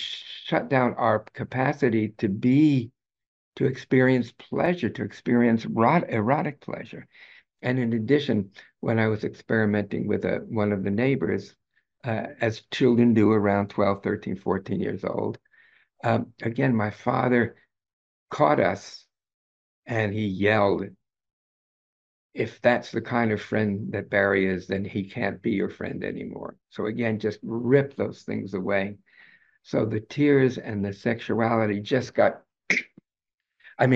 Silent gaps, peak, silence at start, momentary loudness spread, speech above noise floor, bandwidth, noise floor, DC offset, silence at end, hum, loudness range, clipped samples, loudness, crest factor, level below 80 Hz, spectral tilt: 3.26-3.52 s, 17.93-18.27 s, 19.34-19.83 s, 21.33-22.30 s, 33.34-33.38 s; -6 dBFS; 0 s; 11 LU; 63 dB; 7.6 kHz; -87 dBFS; under 0.1%; 0 s; none; 4 LU; under 0.1%; -25 LUFS; 20 dB; -64 dBFS; -7.5 dB/octave